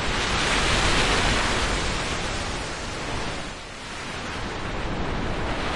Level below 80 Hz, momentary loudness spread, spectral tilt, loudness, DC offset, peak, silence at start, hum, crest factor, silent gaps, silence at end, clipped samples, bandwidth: -32 dBFS; 12 LU; -3 dB/octave; -25 LUFS; under 0.1%; -6 dBFS; 0 s; none; 18 dB; none; 0 s; under 0.1%; 11.5 kHz